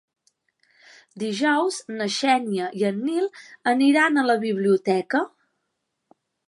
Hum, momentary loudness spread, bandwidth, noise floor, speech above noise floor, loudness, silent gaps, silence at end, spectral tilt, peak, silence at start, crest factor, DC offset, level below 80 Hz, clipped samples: none; 10 LU; 11.5 kHz; -78 dBFS; 56 dB; -22 LUFS; none; 1.2 s; -4.5 dB/octave; -6 dBFS; 1.15 s; 18 dB; under 0.1%; -80 dBFS; under 0.1%